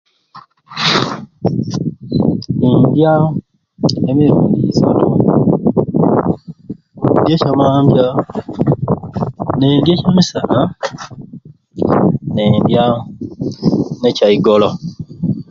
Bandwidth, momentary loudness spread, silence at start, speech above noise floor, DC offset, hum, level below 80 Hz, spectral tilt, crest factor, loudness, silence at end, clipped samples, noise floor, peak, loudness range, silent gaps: 7.6 kHz; 13 LU; 0.35 s; 29 dB; under 0.1%; none; -42 dBFS; -7.5 dB/octave; 14 dB; -14 LUFS; 0.1 s; under 0.1%; -41 dBFS; 0 dBFS; 3 LU; none